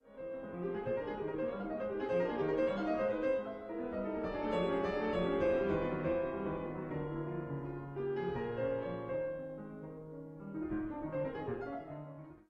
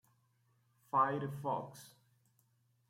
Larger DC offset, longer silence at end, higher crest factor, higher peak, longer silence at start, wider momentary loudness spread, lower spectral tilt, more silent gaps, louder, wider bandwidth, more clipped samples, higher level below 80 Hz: neither; second, 0.1 s vs 1 s; second, 16 dB vs 22 dB; about the same, -22 dBFS vs -20 dBFS; second, 0.05 s vs 0.95 s; second, 12 LU vs 18 LU; first, -8.5 dB/octave vs -6.5 dB/octave; neither; about the same, -37 LUFS vs -36 LUFS; second, 8.2 kHz vs 16.5 kHz; neither; first, -58 dBFS vs -80 dBFS